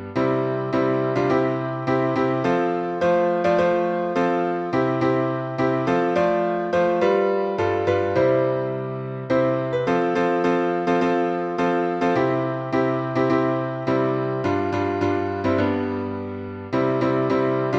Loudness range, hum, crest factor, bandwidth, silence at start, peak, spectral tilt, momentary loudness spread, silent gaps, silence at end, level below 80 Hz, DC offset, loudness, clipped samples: 2 LU; none; 14 dB; 8 kHz; 0 s; -6 dBFS; -8 dB/octave; 4 LU; none; 0 s; -58 dBFS; under 0.1%; -22 LUFS; under 0.1%